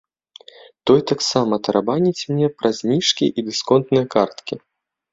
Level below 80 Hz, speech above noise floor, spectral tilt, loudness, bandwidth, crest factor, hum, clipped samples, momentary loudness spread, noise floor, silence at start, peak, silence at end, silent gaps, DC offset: -58 dBFS; 28 dB; -5 dB/octave; -19 LUFS; 7.8 kHz; 18 dB; none; under 0.1%; 7 LU; -46 dBFS; 0.85 s; -2 dBFS; 0.55 s; none; under 0.1%